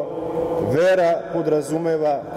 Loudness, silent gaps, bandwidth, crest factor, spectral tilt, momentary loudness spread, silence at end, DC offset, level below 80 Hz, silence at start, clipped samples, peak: -20 LUFS; none; 15 kHz; 12 dB; -6.5 dB/octave; 7 LU; 0 s; under 0.1%; -52 dBFS; 0 s; under 0.1%; -8 dBFS